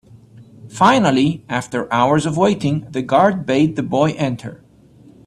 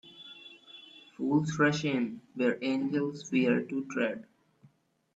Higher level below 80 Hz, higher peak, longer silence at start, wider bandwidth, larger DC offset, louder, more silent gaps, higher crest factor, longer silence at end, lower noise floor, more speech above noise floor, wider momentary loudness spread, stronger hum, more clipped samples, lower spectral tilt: first, -52 dBFS vs -74 dBFS; first, 0 dBFS vs -12 dBFS; first, 0.35 s vs 0.05 s; first, 12 kHz vs 8 kHz; neither; first, -17 LUFS vs -30 LUFS; neither; about the same, 18 dB vs 18 dB; second, 0.7 s vs 0.95 s; second, -47 dBFS vs -67 dBFS; second, 30 dB vs 37 dB; second, 9 LU vs 21 LU; neither; neither; about the same, -6 dB/octave vs -6 dB/octave